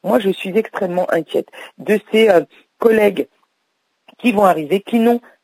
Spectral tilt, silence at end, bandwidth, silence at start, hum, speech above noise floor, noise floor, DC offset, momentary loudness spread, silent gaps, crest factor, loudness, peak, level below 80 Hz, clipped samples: -6 dB/octave; 0.25 s; 16 kHz; 0.05 s; none; 53 dB; -69 dBFS; under 0.1%; 11 LU; none; 16 dB; -16 LUFS; -2 dBFS; -62 dBFS; under 0.1%